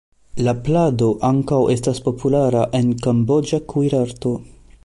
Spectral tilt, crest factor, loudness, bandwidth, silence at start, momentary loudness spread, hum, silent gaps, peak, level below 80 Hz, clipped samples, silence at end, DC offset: -7.5 dB/octave; 14 dB; -18 LUFS; 11.5 kHz; 0.35 s; 6 LU; none; none; -6 dBFS; -44 dBFS; under 0.1%; 0.4 s; under 0.1%